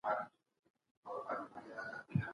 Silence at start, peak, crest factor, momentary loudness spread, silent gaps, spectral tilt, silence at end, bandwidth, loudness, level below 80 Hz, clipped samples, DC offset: 0.05 s; -22 dBFS; 22 dB; 10 LU; 0.59-0.63 s, 0.70-0.74 s, 0.91-1.03 s; -8.5 dB/octave; 0 s; 11 kHz; -44 LUFS; -70 dBFS; under 0.1%; under 0.1%